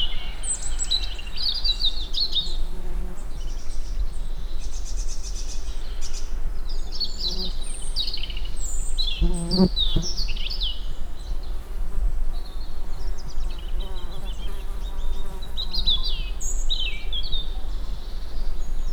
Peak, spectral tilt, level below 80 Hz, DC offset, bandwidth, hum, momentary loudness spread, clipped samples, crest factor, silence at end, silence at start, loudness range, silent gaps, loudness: -6 dBFS; -3.5 dB/octave; -26 dBFS; under 0.1%; 9.6 kHz; none; 13 LU; under 0.1%; 16 dB; 0 s; 0 s; 9 LU; none; -29 LUFS